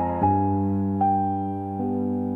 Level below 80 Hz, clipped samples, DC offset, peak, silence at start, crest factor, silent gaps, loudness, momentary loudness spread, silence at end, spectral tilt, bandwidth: -56 dBFS; under 0.1%; under 0.1%; -10 dBFS; 0 s; 14 dB; none; -24 LUFS; 6 LU; 0 s; -12 dB/octave; 3.4 kHz